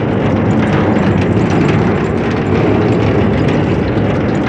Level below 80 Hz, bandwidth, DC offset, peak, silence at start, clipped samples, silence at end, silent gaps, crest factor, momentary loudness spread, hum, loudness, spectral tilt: -30 dBFS; 9 kHz; under 0.1%; 0 dBFS; 0 s; under 0.1%; 0 s; none; 12 dB; 2 LU; none; -13 LUFS; -8 dB/octave